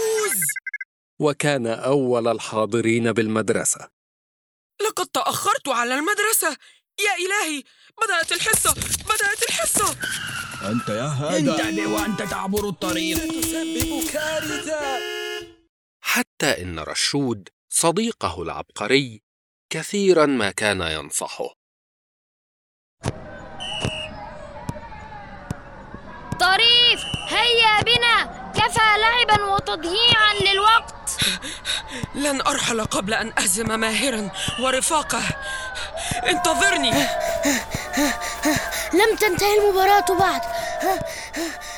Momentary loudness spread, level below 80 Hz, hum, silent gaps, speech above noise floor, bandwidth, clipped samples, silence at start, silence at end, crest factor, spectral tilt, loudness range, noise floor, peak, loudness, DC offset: 15 LU; -46 dBFS; none; 0.85-1.17 s, 3.93-4.70 s, 15.69-16.00 s, 16.27-16.37 s, 17.53-17.68 s, 19.23-19.69 s, 21.56-22.97 s; over 69 dB; over 20 kHz; under 0.1%; 0 s; 0 s; 20 dB; -2.5 dB/octave; 8 LU; under -90 dBFS; -4 dBFS; -20 LUFS; under 0.1%